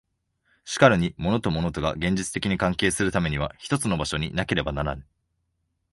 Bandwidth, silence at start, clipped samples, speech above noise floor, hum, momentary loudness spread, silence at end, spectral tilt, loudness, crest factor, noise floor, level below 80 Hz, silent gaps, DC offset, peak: 11.5 kHz; 0.65 s; under 0.1%; 51 dB; none; 10 LU; 0.9 s; -5 dB/octave; -24 LUFS; 22 dB; -75 dBFS; -42 dBFS; none; under 0.1%; -2 dBFS